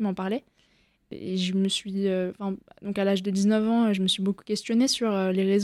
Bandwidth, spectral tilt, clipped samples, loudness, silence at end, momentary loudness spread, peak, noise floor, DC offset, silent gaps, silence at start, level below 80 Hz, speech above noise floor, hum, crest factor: 13 kHz; -5 dB/octave; under 0.1%; -26 LUFS; 0 s; 11 LU; -12 dBFS; -65 dBFS; under 0.1%; none; 0 s; -66 dBFS; 40 dB; none; 14 dB